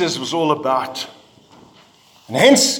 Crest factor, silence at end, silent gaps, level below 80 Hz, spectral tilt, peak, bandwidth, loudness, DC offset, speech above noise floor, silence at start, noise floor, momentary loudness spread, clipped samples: 18 dB; 0 s; none; -62 dBFS; -3 dB/octave; 0 dBFS; 18.5 kHz; -17 LUFS; under 0.1%; 34 dB; 0 s; -50 dBFS; 16 LU; under 0.1%